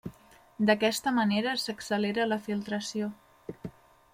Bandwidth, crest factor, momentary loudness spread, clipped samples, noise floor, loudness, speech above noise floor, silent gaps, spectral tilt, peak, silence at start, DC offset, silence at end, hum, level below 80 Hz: 16 kHz; 20 dB; 20 LU; under 0.1%; -56 dBFS; -29 LUFS; 28 dB; none; -4.5 dB/octave; -10 dBFS; 0.05 s; under 0.1%; 0.45 s; none; -66 dBFS